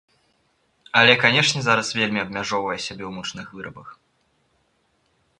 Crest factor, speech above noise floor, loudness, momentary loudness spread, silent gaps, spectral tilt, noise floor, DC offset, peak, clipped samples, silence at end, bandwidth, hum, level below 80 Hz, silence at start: 24 dB; 45 dB; -19 LUFS; 21 LU; none; -3 dB/octave; -67 dBFS; under 0.1%; 0 dBFS; under 0.1%; 1.45 s; 11.5 kHz; none; -60 dBFS; 0.95 s